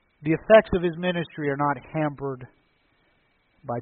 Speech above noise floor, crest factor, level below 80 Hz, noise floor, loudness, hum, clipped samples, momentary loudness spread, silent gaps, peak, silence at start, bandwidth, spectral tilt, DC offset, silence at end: 43 dB; 22 dB; -50 dBFS; -66 dBFS; -23 LUFS; none; under 0.1%; 17 LU; none; -2 dBFS; 0.2 s; 4.3 kHz; -5 dB/octave; under 0.1%; 0 s